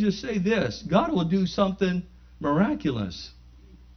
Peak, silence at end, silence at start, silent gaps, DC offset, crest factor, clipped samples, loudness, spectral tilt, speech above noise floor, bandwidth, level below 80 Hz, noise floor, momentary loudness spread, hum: -8 dBFS; 0.2 s; 0 s; none; under 0.1%; 18 dB; under 0.1%; -26 LUFS; -7 dB/octave; 25 dB; 6.6 kHz; -48 dBFS; -49 dBFS; 9 LU; none